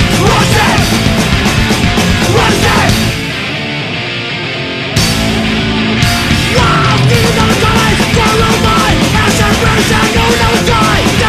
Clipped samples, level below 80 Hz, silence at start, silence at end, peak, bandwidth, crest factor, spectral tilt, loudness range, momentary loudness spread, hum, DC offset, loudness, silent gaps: under 0.1%; -22 dBFS; 0 s; 0 s; 0 dBFS; 14.5 kHz; 10 dB; -4.5 dB/octave; 3 LU; 7 LU; none; 0.3%; -9 LUFS; none